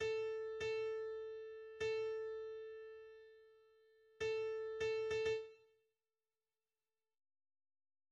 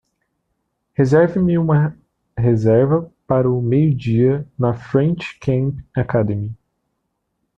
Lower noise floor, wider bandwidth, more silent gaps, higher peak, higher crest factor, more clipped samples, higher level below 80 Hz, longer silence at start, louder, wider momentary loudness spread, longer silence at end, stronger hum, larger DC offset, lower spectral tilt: first, under -90 dBFS vs -73 dBFS; about the same, 8 kHz vs 7.6 kHz; neither; second, -30 dBFS vs -2 dBFS; about the same, 16 dB vs 16 dB; neither; second, -76 dBFS vs -46 dBFS; second, 0 s vs 1 s; second, -43 LUFS vs -18 LUFS; first, 16 LU vs 9 LU; first, 2.55 s vs 1.05 s; neither; neither; second, -3.5 dB/octave vs -9.5 dB/octave